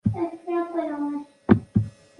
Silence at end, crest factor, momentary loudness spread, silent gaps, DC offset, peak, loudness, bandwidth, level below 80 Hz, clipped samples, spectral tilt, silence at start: 0.3 s; 24 dB; 9 LU; none; under 0.1%; -2 dBFS; -26 LUFS; 9.8 kHz; -46 dBFS; under 0.1%; -10 dB/octave; 0.05 s